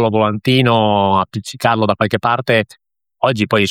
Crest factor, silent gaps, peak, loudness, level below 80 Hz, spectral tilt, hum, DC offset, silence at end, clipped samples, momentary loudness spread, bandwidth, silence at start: 14 dB; none; 0 dBFS; -15 LUFS; -54 dBFS; -6 dB/octave; none; under 0.1%; 0 s; under 0.1%; 6 LU; 16 kHz; 0 s